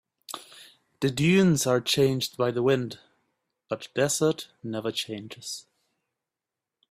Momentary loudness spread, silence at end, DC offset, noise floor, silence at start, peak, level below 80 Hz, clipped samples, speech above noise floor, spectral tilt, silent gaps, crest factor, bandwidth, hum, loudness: 18 LU; 1.3 s; under 0.1%; -88 dBFS; 0.3 s; -10 dBFS; -64 dBFS; under 0.1%; 63 dB; -4.5 dB/octave; none; 18 dB; 15.5 kHz; none; -26 LUFS